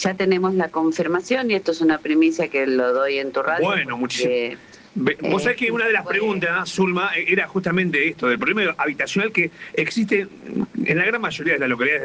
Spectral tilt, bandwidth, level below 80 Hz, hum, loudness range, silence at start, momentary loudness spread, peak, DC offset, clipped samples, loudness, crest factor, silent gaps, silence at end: -5 dB/octave; 9.6 kHz; -62 dBFS; none; 1 LU; 0 s; 5 LU; -4 dBFS; under 0.1%; under 0.1%; -20 LUFS; 16 dB; none; 0 s